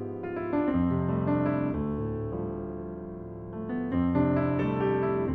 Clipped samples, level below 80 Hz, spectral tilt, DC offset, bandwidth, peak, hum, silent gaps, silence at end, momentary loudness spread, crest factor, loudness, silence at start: under 0.1%; -48 dBFS; -11 dB/octave; under 0.1%; 4.7 kHz; -14 dBFS; none; none; 0 s; 12 LU; 14 dB; -29 LUFS; 0 s